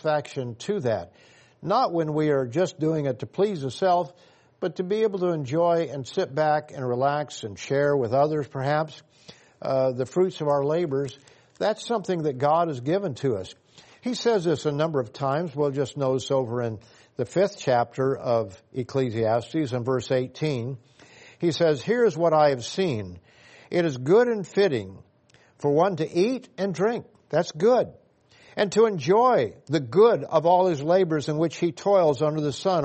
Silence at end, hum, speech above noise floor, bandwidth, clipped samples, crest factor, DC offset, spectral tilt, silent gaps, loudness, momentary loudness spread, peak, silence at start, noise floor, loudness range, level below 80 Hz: 0 s; none; 35 dB; 8.4 kHz; under 0.1%; 18 dB; under 0.1%; -6.5 dB/octave; none; -24 LUFS; 11 LU; -8 dBFS; 0.05 s; -59 dBFS; 5 LU; -66 dBFS